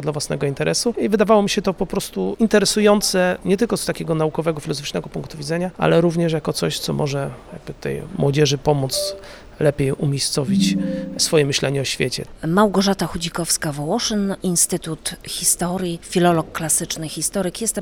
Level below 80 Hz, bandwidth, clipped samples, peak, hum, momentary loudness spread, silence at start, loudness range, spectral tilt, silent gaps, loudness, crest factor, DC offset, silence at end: -44 dBFS; over 20 kHz; under 0.1%; -2 dBFS; none; 10 LU; 0 s; 4 LU; -4 dB/octave; none; -20 LUFS; 18 dB; under 0.1%; 0 s